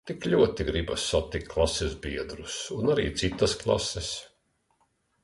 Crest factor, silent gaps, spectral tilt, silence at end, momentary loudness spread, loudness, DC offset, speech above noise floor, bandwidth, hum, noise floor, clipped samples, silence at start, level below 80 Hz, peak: 18 dB; none; -4.5 dB/octave; 0.95 s; 11 LU; -28 LUFS; under 0.1%; 44 dB; 11.5 kHz; none; -71 dBFS; under 0.1%; 0.05 s; -42 dBFS; -10 dBFS